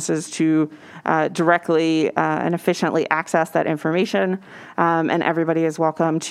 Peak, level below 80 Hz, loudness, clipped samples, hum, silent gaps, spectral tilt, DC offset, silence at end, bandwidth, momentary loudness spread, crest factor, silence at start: 0 dBFS; -72 dBFS; -20 LUFS; under 0.1%; none; none; -5.5 dB/octave; under 0.1%; 0 s; 13.5 kHz; 4 LU; 20 dB; 0 s